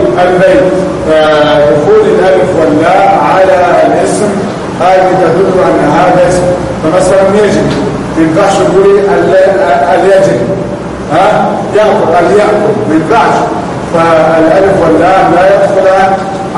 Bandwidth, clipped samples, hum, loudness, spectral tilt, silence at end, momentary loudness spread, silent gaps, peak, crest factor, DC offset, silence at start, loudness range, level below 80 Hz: 11.5 kHz; 2%; none; -7 LUFS; -6 dB/octave; 0 s; 6 LU; none; 0 dBFS; 6 dB; under 0.1%; 0 s; 2 LU; -32 dBFS